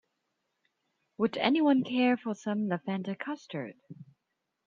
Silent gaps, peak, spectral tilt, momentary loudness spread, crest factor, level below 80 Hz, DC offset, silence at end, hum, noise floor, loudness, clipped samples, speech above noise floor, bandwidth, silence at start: none; -12 dBFS; -6.5 dB/octave; 13 LU; 20 dB; -78 dBFS; under 0.1%; 0.65 s; none; -83 dBFS; -30 LUFS; under 0.1%; 54 dB; 7.4 kHz; 1.2 s